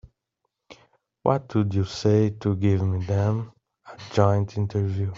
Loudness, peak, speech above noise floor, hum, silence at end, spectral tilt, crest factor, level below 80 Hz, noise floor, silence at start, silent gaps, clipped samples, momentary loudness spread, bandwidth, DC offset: -24 LUFS; -4 dBFS; 57 dB; none; 0 s; -8 dB/octave; 20 dB; -58 dBFS; -79 dBFS; 0.7 s; none; under 0.1%; 7 LU; 7.4 kHz; under 0.1%